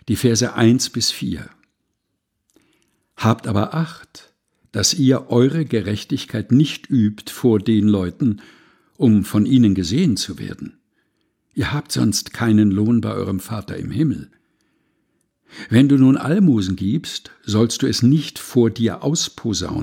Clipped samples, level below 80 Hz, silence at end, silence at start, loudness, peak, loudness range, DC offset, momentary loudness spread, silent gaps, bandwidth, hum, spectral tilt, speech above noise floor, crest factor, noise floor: under 0.1%; -50 dBFS; 0 s; 0.05 s; -18 LUFS; -2 dBFS; 5 LU; under 0.1%; 12 LU; none; 17.5 kHz; none; -5.5 dB/octave; 57 dB; 18 dB; -74 dBFS